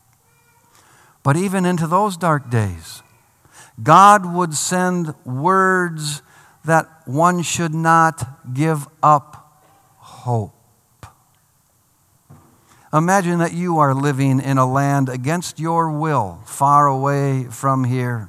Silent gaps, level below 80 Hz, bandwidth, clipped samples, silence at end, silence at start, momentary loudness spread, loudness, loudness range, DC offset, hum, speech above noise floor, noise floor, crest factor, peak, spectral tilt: none; -60 dBFS; 15 kHz; under 0.1%; 0 s; 1.25 s; 12 LU; -17 LUFS; 8 LU; under 0.1%; none; 42 dB; -59 dBFS; 18 dB; 0 dBFS; -5.5 dB/octave